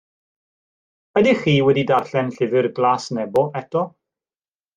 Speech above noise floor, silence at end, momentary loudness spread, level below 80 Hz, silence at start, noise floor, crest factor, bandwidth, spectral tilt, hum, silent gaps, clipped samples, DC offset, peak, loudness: over 72 dB; 0.85 s; 8 LU; -60 dBFS; 1.15 s; under -90 dBFS; 18 dB; 9.4 kHz; -6.5 dB/octave; none; none; under 0.1%; under 0.1%; -4 dBFS; -19 LUFS